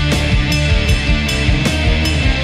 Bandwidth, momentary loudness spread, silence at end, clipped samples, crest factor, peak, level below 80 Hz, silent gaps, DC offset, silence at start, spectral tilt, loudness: 15 kHz; 1 LU; 0 s; under 0.1%; 12 dB; -2 dBFS; -18 dBFS; none; under 0.1%; 0 s; -5 dB/octave; -15 LUFS